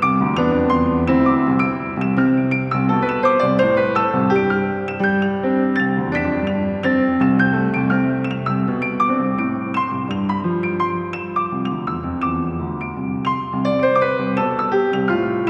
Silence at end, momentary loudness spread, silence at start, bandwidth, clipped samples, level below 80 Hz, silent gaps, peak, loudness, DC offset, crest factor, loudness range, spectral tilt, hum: 0 s; 7 LU; 0 s; 6.4 kHz; under 0.1%; -44 dBFS; none; -2 dBFS; -19 LUFS; under 0.1%; 16 dB; 5 LU; -8.5 dB/octave; none